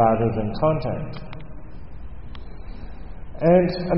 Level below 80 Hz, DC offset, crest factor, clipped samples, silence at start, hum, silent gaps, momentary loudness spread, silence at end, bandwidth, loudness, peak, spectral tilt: -38 dBFS; 2%; 18 dB; under 0.1%; 0 s; none; none; 24 LU; 0 s; 5.6 kHz; -21 LUFS; -6 dBFS; -7 dB/octave